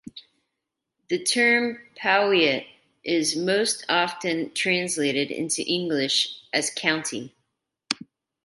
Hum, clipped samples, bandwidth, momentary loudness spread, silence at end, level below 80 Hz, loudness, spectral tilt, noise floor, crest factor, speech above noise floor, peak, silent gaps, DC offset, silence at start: none; under 0.1%; 12 kHz; 11 LU; 0.5 s; -72 dBFS; -23 LUFS; -2.5 dB/octave; -83 dBFS; 24 dB; 59 dB; -2 dBFS; none; under 0.1%; 0.05 s